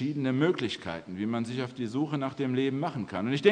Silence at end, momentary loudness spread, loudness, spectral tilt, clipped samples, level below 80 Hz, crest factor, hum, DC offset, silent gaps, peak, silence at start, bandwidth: 0 s; 7 LU; -30 LUFS; -7 dB/octave; under 0.1%; -68 dBFS; 22 dB; none; under 0.1%; none; -8 dBFS; 0 s; 9.8 kHz